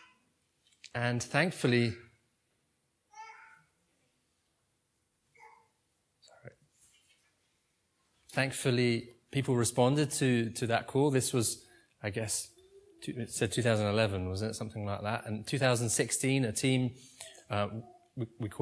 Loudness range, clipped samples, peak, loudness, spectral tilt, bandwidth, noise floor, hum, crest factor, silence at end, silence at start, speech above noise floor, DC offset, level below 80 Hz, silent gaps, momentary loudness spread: 6 LU; under 0.1%; -10 dBFS; -32 LUFS; -4.5 dB/octave; 11 kHz; -78 dBFS; none; 24 dB; 0 s; 0.95 s; 47 dB; under 0.1%; -68 dBFS; none; 15 LU